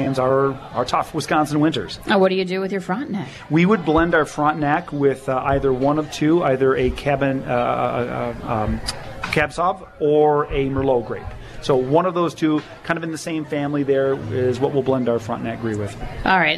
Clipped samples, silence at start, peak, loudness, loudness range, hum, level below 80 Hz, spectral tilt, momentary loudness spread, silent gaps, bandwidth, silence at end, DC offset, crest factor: under 0.1%; 0 s; -4 dBFS; -20 LUFS; 3 LU; none; -40 dBFS; -6 dB/octave; 9 LU; none; 13.5 kHz; 0 s; under 0.1%; 16 dB